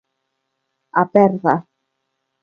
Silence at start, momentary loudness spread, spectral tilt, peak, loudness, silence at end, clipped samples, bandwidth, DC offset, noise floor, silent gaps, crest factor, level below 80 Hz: 0.95 s; 8 LU; -10 dB/octave; 0 dBFS; -17 LUFS; 0.8 s; under 0.1%; 6.6 kHz; under 0.1%; -74 dBFS; none; 20 dB; -64 dBFS